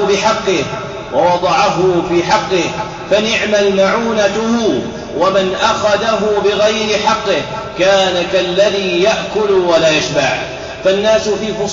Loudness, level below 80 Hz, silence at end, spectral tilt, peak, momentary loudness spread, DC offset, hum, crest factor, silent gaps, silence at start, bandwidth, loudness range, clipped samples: -13 LUFS; -42 dBFS; 0 s; -4 dB/octave; -2 dBFS; 6 LU; under 0.1%; none; 10 dB; none; 0 s; 7.8 kHz; 1 LU; under 0.1%